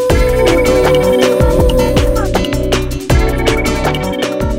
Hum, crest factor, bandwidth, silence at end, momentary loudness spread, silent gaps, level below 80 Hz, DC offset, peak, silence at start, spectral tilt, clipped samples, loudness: none; 12 dB; 17 kHz; 0 s; 6 LU; none; -18 dBFS; under 0.1%; 0 dBFS; 0 s; -5.5 dB/octave; under 0.1%; -12 LUFS